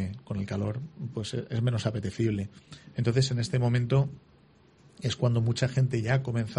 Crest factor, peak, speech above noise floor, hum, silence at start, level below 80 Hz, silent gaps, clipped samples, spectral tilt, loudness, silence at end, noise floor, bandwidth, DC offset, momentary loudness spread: 16 dB; -12 dBFS; 31 dB; none; 0 s; -56 dBFS; none; under 0.1%; -6.5 dB/octave; -29 LUFS; 0 s; -59 dBFS; 10.5 kHz; under 0.1%; 10 LU